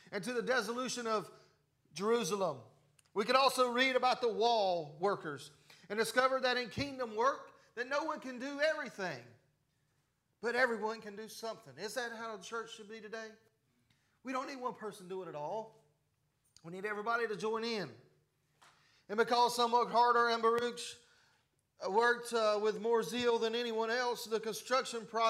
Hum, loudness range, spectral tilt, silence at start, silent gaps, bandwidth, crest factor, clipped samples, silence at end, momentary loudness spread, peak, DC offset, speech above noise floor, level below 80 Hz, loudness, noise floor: none; 12 LU; -3 dB/octave; 0.1 s; none; 15.5 kHz; 20 dB; under 0.1%; 0 s; 16 LU; -16 dBFS; under 0.1%; 44 dB; -78 dBFS; -35 LUFS; -79 dBFS